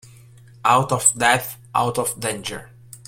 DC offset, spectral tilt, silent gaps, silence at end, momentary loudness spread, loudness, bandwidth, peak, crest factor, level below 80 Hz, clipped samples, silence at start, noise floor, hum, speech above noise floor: under 0.1%; -2.5 dB/octave; none; 0.1 s; 13 LU; -19 LUFS; 16.5 kHz; 0 dBFS; 22 dB; -56 dBFS; under 0.1%; 0.65 s; -46 dBFS; none; 26 dB